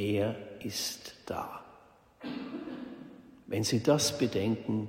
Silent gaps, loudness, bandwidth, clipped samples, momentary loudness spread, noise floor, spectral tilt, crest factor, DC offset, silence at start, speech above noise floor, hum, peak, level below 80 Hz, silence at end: none; -33 LUFS; 16 kHz; under 0.1%; 19 LU; -59 dBFS; -4.5 dB/octave; 22 dB; under 0.1%; 0 s; 28 dB; none; -12 dBFS; -66 dBFS; 0 s